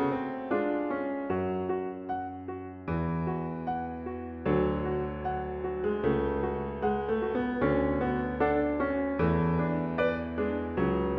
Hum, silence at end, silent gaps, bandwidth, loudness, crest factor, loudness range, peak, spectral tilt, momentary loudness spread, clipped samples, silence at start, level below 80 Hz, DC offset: none; 0 s; none; 5.2 kHz; -31 LUFS; 16 dB; 5 LU; -14 dBFS; -10.5 dB/octave; 8 LU; under 0.1%; 0 s; -46 dBFS; under 0.1%